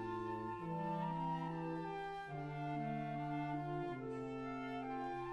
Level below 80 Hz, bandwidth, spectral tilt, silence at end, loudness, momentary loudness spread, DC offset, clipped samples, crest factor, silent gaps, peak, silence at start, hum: -68 dBFS; 11 kHz; -8 dB/octave; 0 s; -43 LUFS; 4 LU; under 0.1%; under 0.1%; 12 dB; none; -30 dBFS; 0 s; none